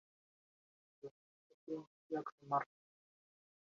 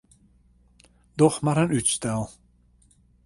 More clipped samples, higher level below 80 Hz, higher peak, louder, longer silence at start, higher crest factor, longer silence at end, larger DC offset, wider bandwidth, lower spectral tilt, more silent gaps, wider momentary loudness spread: neither; second, under -90 dBFS vs -54 dBFS; second, -24 dBFS vs -4 dBFS; second, -44 LUFS vs -23 LUFS; about the same, 1.05 s vs 1.15 s; about the same, 26 dB vs 22 dB; first, 1.15 s vs 0.95 s; neither; second, 7.2 kHz vs 11.5 kHz; about the same, -6 dB/octave vs -5 dB/octave; first, 1.11-1.67 s, 1.87-2.10 s, 2.32-2.38 s vs none; first, 17 LU vs 14 LU